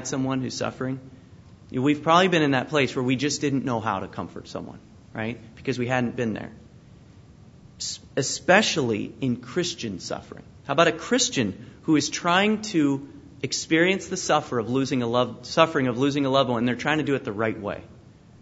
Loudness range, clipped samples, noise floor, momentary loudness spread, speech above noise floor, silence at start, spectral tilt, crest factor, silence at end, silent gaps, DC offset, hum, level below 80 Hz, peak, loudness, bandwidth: 7 LU; under 0.1%; -49 dBFS; 14 LU; 25 dB; 0 s; -4.5 dB/octave; 24 dB; 0.4 s; none; under 0.1%; none; -58 dBFS; -2 dBFS; -24 LUFS; 8 kHz